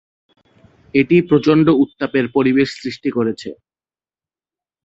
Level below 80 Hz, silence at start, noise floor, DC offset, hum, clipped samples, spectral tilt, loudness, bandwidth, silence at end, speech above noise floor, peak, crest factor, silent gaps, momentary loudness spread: -54 dBFS; 0.95 s; under -90 dBFS; under 0.1%; none; under 0.1%; -7.5 dB/octave; -16 LUFS; 8 kHz; 1.3 s; over 75 dB; -2 dBFS; 16 dB; none; 10 LU